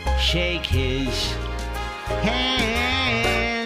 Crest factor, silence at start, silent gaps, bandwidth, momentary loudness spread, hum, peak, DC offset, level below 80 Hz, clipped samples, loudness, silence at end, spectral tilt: 18 dB; 0 s; none; 15.5 kHz; 9 LU; none; -6 dBFS; under 0.1%; -30 dBFS; under 0.1%; -22 LUFS; 0 s; -4.5 dB/octave